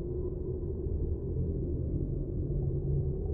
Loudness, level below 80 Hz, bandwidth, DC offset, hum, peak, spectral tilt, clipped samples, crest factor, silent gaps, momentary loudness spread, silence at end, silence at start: -34 LUFS; -38 dBFS; 1.5 kHz; under 0.1%; none; -20 dBFS; -16.5 dB/octave; under 0.1%; 12 dB; none; 4 LU; 0 s; 0 s